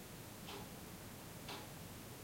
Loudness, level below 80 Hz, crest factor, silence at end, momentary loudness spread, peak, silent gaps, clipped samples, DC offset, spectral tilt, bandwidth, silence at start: -51 LUFS; -66 dBFS; 16 dB; 0 s; 3 LU; -36 dBFS; none; under 0.1%; under 0.1%; -4 dB/octave; 16.5 kHz; 0 s